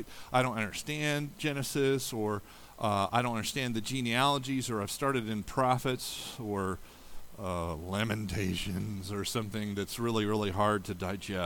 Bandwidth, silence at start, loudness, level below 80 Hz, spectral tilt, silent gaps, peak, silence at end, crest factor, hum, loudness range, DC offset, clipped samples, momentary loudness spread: 19 kHz; 0 s; -32 LUFS; -54 dBFS; -4.5 dB/octave; none; -14 dBFS; 0 s; 20 dB; none; 4 LU; under 0.1%; under 0.1%; 8 LU